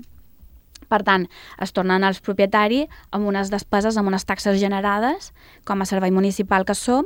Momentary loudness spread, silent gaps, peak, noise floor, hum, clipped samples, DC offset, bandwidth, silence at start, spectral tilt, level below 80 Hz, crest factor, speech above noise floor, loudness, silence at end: 9 LU; none; -2 dBFS; -48 dBFS; none; under 0.1%; under 0.1%; 16.5 kHz; 0.55 s; -5 dB/octave; -48 dBFS; 18 dB; 28 dB; -21 LUFS; 0 s